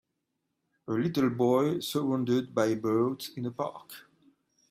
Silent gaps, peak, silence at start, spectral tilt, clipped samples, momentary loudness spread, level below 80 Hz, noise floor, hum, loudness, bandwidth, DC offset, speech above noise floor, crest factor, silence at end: none; -12 dBFS; 0.9 s; -6.5 dB/octave; under 0.1%; 17 LU; -72 dBFS; -82 dBFS; none; -29 LUFS; 16 kHz; under 0.1%; 53 dB; 18 dB; 0.7 s